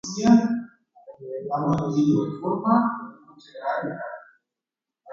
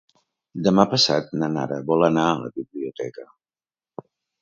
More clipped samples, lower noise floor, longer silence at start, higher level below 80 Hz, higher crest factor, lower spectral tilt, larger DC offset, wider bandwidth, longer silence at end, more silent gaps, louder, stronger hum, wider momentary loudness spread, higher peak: neither; about the same, -89 dBFS vs under -90 dBFS; second, 0.05 s vs 0.55 s; about the same, -60 dBFS vs -60 dBFS; about the same, 20 dB vs 22 dB; first, -6.5 dB/octave vs -5 dB/octave; neither; about the same, 7.6 kHz vs 8 kHz; second, 0 s vs 1.2 s; neither; about the same, -23 LUFS vs -21 LUFS; neither; second, 20 LU vs 24 LU; second, -6 dBFS vs 0 dBFS